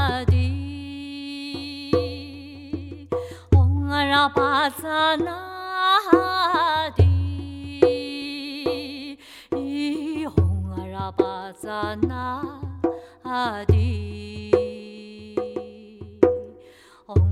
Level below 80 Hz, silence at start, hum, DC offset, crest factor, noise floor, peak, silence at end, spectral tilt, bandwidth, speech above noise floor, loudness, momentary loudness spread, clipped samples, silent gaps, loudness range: -38 dBFS; 0 s; none; under 0.1%; 24 dB; -50 dBFS; 0 dBFS; 0 s; -7 dB/octave; 13.5 kHz; 28 dB; -23 LUFS; 15 LU; under 0.1%; none; 7 LU